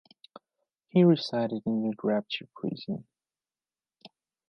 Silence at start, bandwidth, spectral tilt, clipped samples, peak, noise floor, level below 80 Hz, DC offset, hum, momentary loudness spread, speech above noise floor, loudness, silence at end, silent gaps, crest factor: 0.95 s; 6.4 kHz; -8 dB/octave; under 0.1%; -10 dBFS; under -90 dBFS; -78 dBFS; under 0.1%; none; 14 LU; over 63 dB; -28 LUFS; 0.4 s; none; 20 dB